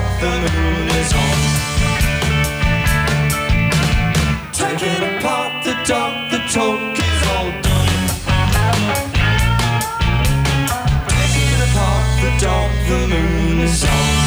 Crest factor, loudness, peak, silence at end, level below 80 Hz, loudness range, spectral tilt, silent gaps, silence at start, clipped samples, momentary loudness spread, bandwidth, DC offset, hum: 12 dB; -16 LUFS; -4 dBFS; 0 s; -22 dBFS; 2 LU; -4.5 dB/octave; none; 0 s; under 0.1%; 3 LU; over 20 kHz; under 0.1%; none